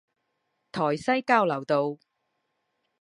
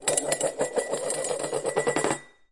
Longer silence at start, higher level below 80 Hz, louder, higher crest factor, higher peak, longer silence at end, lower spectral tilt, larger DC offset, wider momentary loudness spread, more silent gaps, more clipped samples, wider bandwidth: first, 0.75 s vs 0 s; second, -72 dBFS vs -64 dBFS; about the same, -25 LUFS vs -27 LUFS; about the same, 22 dB vs 22 dB; about the same, -6 dBFS vs -6 dBFS; first, 1.05 s vs 0.25 s; first, -6 dB/octave vs -2.5 dB/octave; second, under 0.1% vs 0.1%; first, 13 LU vs 4 LU; neither; neither; about the same, 11.5 kHz vs 11.5 kHz